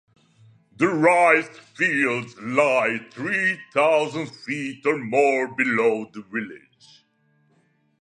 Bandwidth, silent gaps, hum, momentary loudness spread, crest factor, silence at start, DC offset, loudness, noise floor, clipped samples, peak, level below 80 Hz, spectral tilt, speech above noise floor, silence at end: 11 kHz; none; none; 13 LU; 20 dB; 0.8 s; under 0.1%; -21 LUFS; -65 dBFS; under 0.1%; -4 dBFS; -74 dBFS; -5 dB/octave; 43 dB; 1.45 s